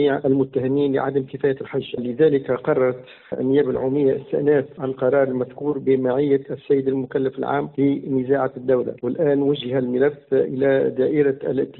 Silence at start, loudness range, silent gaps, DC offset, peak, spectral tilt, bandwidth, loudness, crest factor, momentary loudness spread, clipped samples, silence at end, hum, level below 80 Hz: 0 s; 1 LU; none; under 0.1%; -6 dBFS; -6.5 dB/octave; 4.2 kHz; -21 LUFS; 14 dB; 5 LU; under 0.1%; 0.05 s; none; -60 dBFS